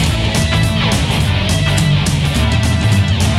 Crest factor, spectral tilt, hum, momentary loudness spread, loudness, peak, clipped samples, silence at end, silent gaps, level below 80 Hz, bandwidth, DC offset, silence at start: 12 dB; -5 dB/octave; none; 1 LU; -14 LUFS; -2 dBFS; under 0.1%; 0 s; none; -22 dBFS; 15.5 kHz; under 0.1%; 0 s